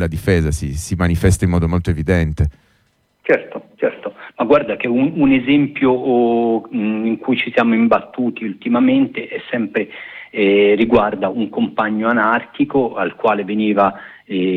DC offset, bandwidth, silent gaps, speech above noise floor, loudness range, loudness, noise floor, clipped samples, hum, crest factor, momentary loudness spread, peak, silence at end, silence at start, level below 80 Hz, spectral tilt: under 0.1%; 14.5 kHz; none; 45 dB; 3 LU; -17 LUFS; -61 dBFS; under 0.1%; none; 14 dB; 9 LU; -2 dBFS; 0 s; 0 s; -34 dBFS; -6.5 dB/octave